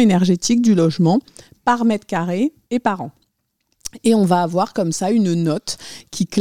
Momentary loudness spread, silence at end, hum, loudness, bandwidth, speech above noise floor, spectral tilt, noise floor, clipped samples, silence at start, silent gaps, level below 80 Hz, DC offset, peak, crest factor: 13 LU; 0 s; none; -18 LUFS; 14.5 kHz; 52 dB; -6 dB/octave; -69 dBFS; under 0.1%; 0 s; none; -56 dBFS; 0.4%; -2 dBFS; 14 dB